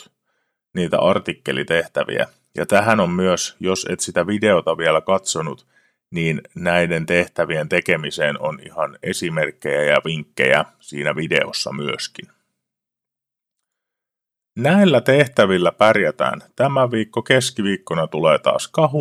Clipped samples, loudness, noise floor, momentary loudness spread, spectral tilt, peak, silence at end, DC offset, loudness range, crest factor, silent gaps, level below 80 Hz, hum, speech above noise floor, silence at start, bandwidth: under 0.1%; -19 LUFS; -86 dBFS; 10 LU; -4.5 dB/octave; 0 dBFS; 0 s; under 0.1%; 5 LU; 20 dB; none; -58 dBFS; none; 68 dB; 0.75 s; 15 kHz